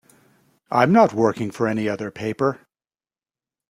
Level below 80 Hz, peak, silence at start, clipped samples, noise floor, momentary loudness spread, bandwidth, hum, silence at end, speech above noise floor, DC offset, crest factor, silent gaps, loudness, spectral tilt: -62 dBFS; -2 dBFS; 0.7 s; under 0.1%; under -90 dBFS; 12 LU; 14 kHz; none; 1.15 s; over 70 dB; under 0.1%; 20 dB; none; -20 LUFS; -7 dB/octave